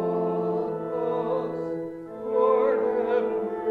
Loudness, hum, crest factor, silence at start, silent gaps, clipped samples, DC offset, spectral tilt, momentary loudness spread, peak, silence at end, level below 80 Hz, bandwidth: -26 LUFS; none; 16 dB; 0 s; none; under 0.1%; under 0.1%; -9 dB/octave; 10 LU; -10 dBFS; 0 s; -66 dBFS; 4.7 kHz